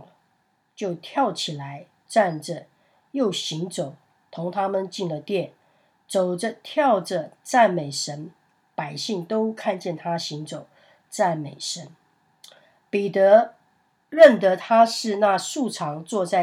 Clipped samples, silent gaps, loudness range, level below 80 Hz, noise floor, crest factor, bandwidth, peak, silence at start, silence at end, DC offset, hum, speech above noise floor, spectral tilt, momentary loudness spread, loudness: under 0.1%; none; 10 LU; -82 dBFS; -68 dBFS; 24 dB; 14.5 kHz; 0 dBFS; 0.8 s; 0 s; under 0.1%; none; 46 dB; -4.5 dB/octave; 17 LU; -22 LUFS